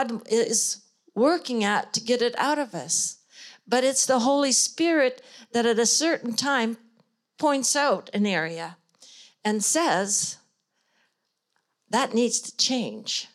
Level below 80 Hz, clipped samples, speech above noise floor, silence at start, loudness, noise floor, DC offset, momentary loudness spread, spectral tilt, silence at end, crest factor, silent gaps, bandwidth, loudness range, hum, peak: -82 dBFS; under 0.1%; 52 dB; 0 s; -24 LUFS; -77 dBFS; under 0.1%; 10 LU; -2 dB/octave; 0.1 s; 16 dB; none; 15.5 kHz; 5 LU; none; -8 dBFS